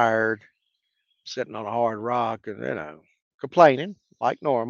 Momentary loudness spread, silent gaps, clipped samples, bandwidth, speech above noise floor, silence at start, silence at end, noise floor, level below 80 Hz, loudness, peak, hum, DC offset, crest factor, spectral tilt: 17 LU; 3.22-3.38 s; under 0.1%; 7.2 kHz; 53 dB; 0 s; 0 s; -76 dBFS; -72 dBFS; -24 LUFS; -2 dBFS; none; under 0.1%; 22 dB; -6 dB/octave